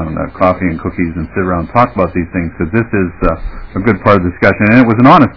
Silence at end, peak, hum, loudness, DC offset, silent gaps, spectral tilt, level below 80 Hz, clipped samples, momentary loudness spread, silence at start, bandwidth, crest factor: 0.05 s; 0 dBFS; none; -12 LUFS; 1%; none; -9.5 dB/octave; -28 dBFS; 2%; 10 LU; 0 s; 5.4 kHz; 12 dB